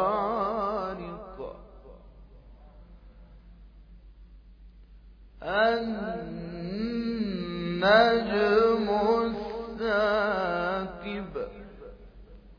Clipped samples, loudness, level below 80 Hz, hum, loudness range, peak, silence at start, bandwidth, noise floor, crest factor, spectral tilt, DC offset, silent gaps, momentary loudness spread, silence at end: under 0.1%; -27 LUFS; -50 dBFS; none; 14 LU; -8 dBFS; 0 s; 5.2 kHz; -51 dBFS; 22 dB; -7 dB/octave; under 0.1%; none; 18 LU; 0.05 s